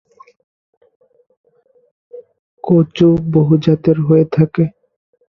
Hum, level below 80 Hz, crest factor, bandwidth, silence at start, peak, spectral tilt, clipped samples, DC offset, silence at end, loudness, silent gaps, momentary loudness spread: none; -50 dBFS; 16 dB; 6.2 kHz; 2.15 s; 0 dBFS; -10 dB/octave; under 0.1%; under 0.1%; 0.6 s; -13 LUFS; 2.39-2.57 s; 6 LU